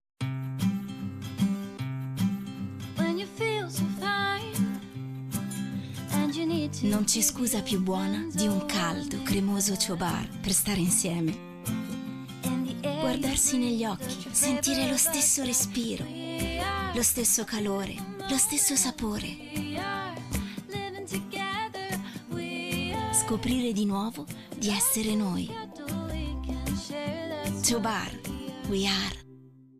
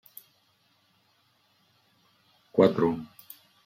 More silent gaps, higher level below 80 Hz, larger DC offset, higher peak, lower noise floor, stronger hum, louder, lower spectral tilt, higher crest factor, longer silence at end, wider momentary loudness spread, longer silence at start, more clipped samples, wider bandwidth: neither; first, -48 dBFS vs -68 dBFS; neither; second, -12 dBFS vs -6 dBFS; second, -52 dBFS vs -68 dBFS; neither; second, -28 LUFS vs -25 LUFS; second, -3.5 dB/octave vs -8 dB/octave; second, 18 dB vs 24 dB; second, 0.3 s vs 0.6 s; second, 12 LU vs 27 LU; second, 0.2 s vs 2.55 s; neither; about the same, 15.5 kHz vs 16 kHz